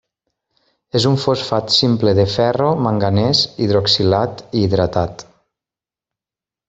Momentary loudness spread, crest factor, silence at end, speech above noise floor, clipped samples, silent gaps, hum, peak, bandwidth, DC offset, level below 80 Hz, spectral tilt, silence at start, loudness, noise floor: 6 LU; 16 dB; 1.45 s; 73 dB; under 0.1%; none; none; -2 dBFS; 8 kHz; under 0.1%; -48 dBFS; -6 dB/octave; 0.95 s; -16 LUFS; -89 dBFS